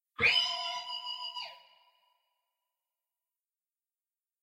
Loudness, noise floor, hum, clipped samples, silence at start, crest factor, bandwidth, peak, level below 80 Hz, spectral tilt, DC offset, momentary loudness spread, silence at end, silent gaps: -30 LUFS; under -90 dBFS; none; under 0.1%; 0.2 s; 24 dB; 16 kHz; -14 dBFS; -70 dBFS; -1 dB/octave; under 0.1%; 16 LU; 2.85 s; none